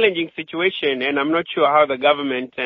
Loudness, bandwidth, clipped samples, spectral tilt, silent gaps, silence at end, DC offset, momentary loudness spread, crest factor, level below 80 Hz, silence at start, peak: -19 LUFS; 5.4 kHz; under 0.1%; -1.5 dB/octave; none; 0 s; under 0.1%; 8 LU; 18 dB; -64 dBFS; 0 s; -2 dBFS